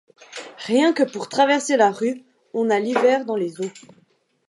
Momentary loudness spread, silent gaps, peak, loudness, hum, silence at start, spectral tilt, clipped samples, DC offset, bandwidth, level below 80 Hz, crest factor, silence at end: 16 LU; none; -4 dBFS; -20 LUFS; none; 0.3 s; -4 dB/octave; under 0.1%; under 0.1%; 11.5 kHz; -80 dBFS; 18 dB; 0.7 s